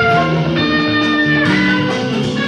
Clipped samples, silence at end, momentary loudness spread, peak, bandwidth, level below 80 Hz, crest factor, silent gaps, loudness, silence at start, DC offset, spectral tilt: under 0.1%; 0 s; 4 LU; -2 dBFS; 10 kHz; -42 dBFS; 12 dB; none; -14 LUFS; 0 s; under 0.1%; -6 dB/octave